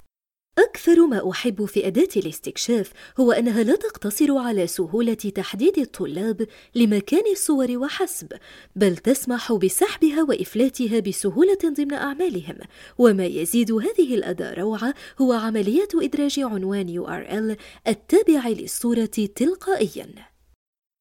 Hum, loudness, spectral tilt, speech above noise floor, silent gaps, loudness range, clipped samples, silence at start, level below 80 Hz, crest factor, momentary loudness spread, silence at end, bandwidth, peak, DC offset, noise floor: none; -22 LUFS; -5 dB/octave; 52 dB; none; 2 LU; under 0.1%; 0.55 s; -58 dBFS; 18 dB; 9 LU; 0.8 s; 17 kHz; -4 dBFS; under 0.1%; -73 dBFS